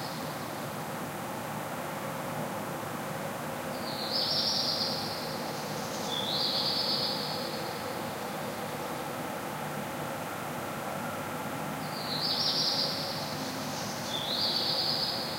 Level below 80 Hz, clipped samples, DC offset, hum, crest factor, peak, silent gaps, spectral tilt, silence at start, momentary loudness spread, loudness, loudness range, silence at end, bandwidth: -66 dBFS; under 0.1%; under 0.1%; none; 18 dB; -16 dBFS; none; -3 dB/octave; 0 s; 9 LU; -32 LUFS; 7 LU; 0 s; 16 kHz